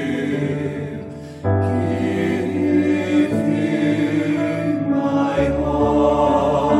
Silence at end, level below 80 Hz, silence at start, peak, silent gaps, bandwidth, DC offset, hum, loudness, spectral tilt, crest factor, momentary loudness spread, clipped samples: 0 s; -40 dBFS; 0 s; -4 dBFS; none; 11 kHz; under 0.1%; none; -19 LUFS; -7.5 dB/octave; 14 dB; 8 LU; under 0.1%